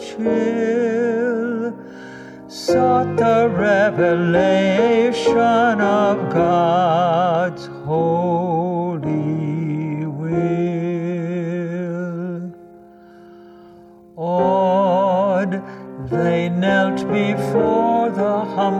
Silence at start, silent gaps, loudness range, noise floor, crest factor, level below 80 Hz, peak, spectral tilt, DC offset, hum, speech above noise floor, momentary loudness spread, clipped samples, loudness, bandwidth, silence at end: 0 s; none; 8 LU; -44 dBFS; 14 dB; -54 dBFS; -4 dBFS; -7 dB/octave; under 0.1%; none; 29 dB; 10 LU; under 0.1%; -18 LUFS; 11.5 kHz; 0 s